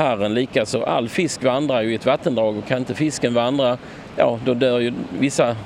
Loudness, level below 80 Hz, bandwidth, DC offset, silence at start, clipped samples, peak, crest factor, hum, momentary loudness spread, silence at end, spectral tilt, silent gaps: -20 LUFS; -54 dBFS; 14 kHz; under 0.1%; 0 s; under 0.1%; -2 dBFS; 18 dB; none; 4 LU; 0 s; -5 dB/octave; none